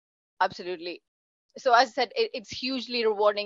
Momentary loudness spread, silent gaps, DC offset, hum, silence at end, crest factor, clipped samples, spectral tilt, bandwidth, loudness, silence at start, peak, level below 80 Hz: 14 LU; 1.08-1.49 s; under 0.1%; none; 0 s; 22 dB; under 0.1%; -3 dB/octave; 7.8 kHz; -27 LUFS; 0.4 s; -6 dBFS; -72 dBFS